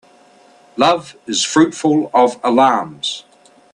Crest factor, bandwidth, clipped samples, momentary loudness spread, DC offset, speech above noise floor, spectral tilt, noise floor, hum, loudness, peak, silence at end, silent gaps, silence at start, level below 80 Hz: 16 dB; 11 kHz; under 0.1%; 10 LU; under 0.1%; 33 dB; -3.5 dB/octave; -48 dBFS; none; -15 LUFS; 0 dBFS; 0.55 s; none; 0.75 s; -62 dBFS